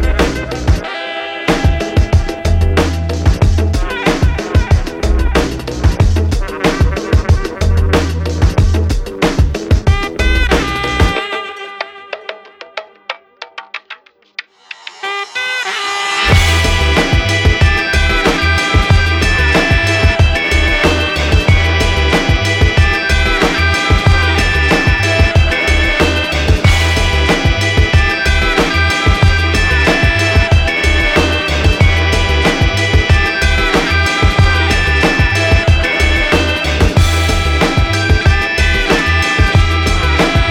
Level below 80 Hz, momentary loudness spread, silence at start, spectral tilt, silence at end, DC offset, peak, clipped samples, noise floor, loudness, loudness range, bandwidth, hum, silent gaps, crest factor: -16 dBFS; 8 LU; 0 s; -5 dB/octave; 0 s; under 0.1%; 0 dBFS; under 0.1%; -36 dBFS; -12 LUFS; 5 LU; 13.5 kHz; none; none; 12 dB